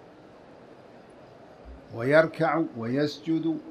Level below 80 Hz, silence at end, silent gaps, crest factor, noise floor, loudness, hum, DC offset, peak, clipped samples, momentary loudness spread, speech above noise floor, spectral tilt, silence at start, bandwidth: -58 dBFS; 0 s; none; 22 dB; -50 dBFS; -26 LUFS; none; under 0.1%; -6 dBFS; under 0.1%; 21 LU; 25 dB; -7 dB/octave; 0.6 s; 10 kHz